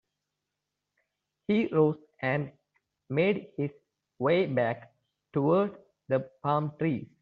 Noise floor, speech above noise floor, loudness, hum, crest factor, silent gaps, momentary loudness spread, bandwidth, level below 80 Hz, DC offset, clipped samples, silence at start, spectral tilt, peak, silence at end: -86 dBFS; 58 dB; -29 LUFS; 50 Hz at -55 dBFS; 20 dB; none; 10 LU; 5.2 kHz; -70 dBFS; under 0.1%; under 0.1%; 1.5 s; -6.5 dB/octave; -12 dBFS; 0.15 s